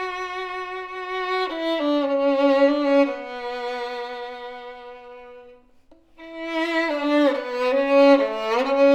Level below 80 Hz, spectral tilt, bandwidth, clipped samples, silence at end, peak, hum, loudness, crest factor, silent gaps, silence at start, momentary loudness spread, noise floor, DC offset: -60 dBFS; -3.5 dB/octave; 8.6 kHz; under 0.1%; 0 s; -4 dBFS; none; -22 LUFS; 18 dB; none; 0 s; 19 LU; -53 dBFS; under 0.1%